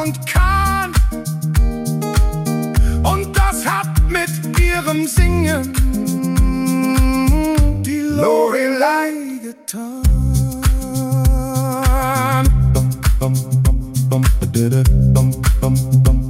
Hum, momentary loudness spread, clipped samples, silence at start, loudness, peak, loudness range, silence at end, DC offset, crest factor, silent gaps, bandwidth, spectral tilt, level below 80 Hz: none; 5 LU; under 0.1%; 0 s; -16 LUFS; -2 dBFS; 2 LU; 0 s; under 0.1%; 14 dB; none; 16.5 kHz; -6 dB/octave; -18 dBFS